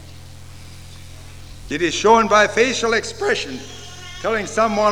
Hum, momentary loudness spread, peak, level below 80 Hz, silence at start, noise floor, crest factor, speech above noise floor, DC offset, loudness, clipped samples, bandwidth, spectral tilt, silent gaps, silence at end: none; 25 LU; -2 dBFS; -46 dBFS; 0 s; -39 dBFS; 18 dB; 22 dB; 0.8%; -18 LUFS; under 0.1%; 15.5 kHz; -3 dB/octave; none; 0 s